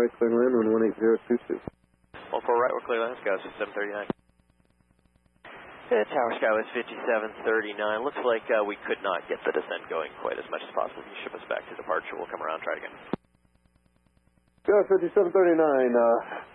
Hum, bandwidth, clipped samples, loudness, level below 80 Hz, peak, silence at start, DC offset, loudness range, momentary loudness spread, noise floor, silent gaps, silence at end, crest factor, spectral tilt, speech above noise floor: none; 4.1 kHz; under 0.1%; -27 LUFS; -68 dBFS; -10 dBFS; 0 s; under 0.1%; 8 LU; 14 LU; -66 dBFS; none; 0.1 s; 16 dB; -8 dB/octave; 39 dB